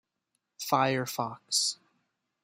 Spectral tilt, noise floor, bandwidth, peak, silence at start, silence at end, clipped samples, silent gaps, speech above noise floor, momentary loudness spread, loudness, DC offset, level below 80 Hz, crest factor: -2.5 dB/octave; -82 dBFS; 16 kHz; -10 dBFS; 0.6 s; 0.7 s; under 0.1%; none; 52 dB; 11 LU; -29 LUFS; under 0.1%; -76 dBFS; 22 dB